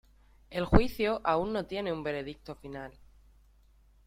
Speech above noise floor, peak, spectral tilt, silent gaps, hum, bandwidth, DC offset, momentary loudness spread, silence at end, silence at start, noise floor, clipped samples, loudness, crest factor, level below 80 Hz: 32 dB; -6 dBFS; -7.5 dB/octave; none; none; 16 kHz; under 0.1%; 17 LU; 1.15 s; 0.5 s; -62 dBFS; under 0.1%; -31 LUFS; 26 dB; -40 dBFS